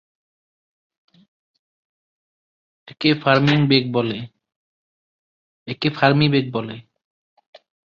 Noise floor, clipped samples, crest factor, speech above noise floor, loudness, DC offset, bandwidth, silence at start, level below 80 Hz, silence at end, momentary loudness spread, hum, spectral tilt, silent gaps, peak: under -90 dBFS; under 0.1%; 20 dB; over 72 dB; -18 LUFS; under 0.1%; 7 kHz; 2.85 s; -60 dBFS; 1.15 s; 18 LU; none; -7.5 dB/octave; 4.56-5.66 s; -2 dBFS